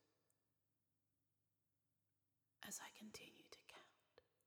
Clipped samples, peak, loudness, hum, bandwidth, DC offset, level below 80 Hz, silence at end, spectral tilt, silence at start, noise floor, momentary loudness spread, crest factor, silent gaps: under 0.1%; -36 dBFS; -58 LUFS; none; over 20 kHz; under 0.1%; under -90 dBFS; 0.25 s; -1.5 dB/octave; 0 s; -90 dBFS; 12 LU; 28 dB; none